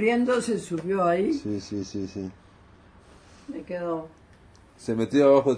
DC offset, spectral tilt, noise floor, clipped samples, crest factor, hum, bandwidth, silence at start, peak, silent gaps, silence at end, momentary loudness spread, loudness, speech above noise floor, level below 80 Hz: under 0.1%; -6 dB/octave; -53 dBFS; under 0.1%; 18 dB; none; 11 kHz; 0 s; -8 dBFS; none; 0 s; 19 LU; -26 LUFS; 29 dB; -58 dBFS